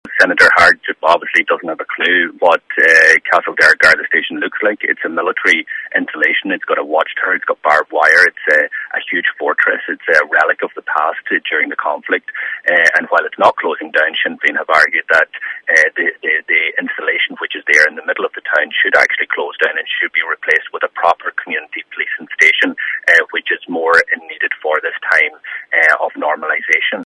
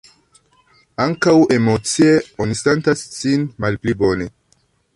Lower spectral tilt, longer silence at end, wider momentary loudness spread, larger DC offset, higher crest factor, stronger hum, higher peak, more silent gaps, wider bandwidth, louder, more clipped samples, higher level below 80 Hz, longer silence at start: second, -2 dB/octave vs -5.5 dB/octave; second, 0.05 s vs 0.65 s; about the same, 10 LU vs 9 LU; neither; about the same, 14 dB vs 16 dB; neither; about the same, 0 dBFS vs -2 dBFS; neither; first, 15.5 kHz vs 11.5 kHz; first, -13 LUFS vs -17 LUFS; first, 0.2% vs under 0.1%; second, -58 dBFS vs -46 dBFS; second, 0.05 s vs 1 s